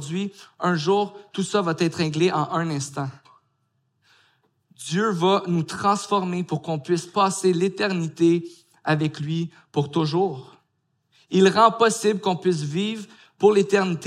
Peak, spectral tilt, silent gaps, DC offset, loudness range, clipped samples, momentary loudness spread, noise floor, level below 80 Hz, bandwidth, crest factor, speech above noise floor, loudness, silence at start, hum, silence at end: -4 dBFS; -5.5 dB/octave; none; under 0.1%; 5 LU; under 0.1%; 11 LU; -72 dBFS; -72 dBFS; 13.5 kHz; 20 dB; 50 dB; -22 LUFS; 0 s; none; 0 s